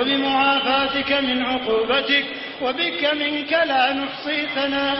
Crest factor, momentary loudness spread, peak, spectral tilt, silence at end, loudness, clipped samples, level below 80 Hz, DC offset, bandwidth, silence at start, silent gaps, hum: 14 dB; 6 LU; -6 dBFS; -7.5 dB/octave; 0 s; -20 LUFS; under 0.1%; -54 dBFS; under 0.1%; 5.8 kHz; 0 s; none; none